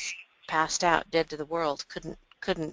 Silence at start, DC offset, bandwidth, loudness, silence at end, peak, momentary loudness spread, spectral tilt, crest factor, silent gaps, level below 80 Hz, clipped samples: 0 s; under 0.1%; 10 kHz; -29 LUFS; 0 s; -6 dBFS; 15 LU; -3 dB/octave; 24 dB; none; -56 dBFS; under 0.1%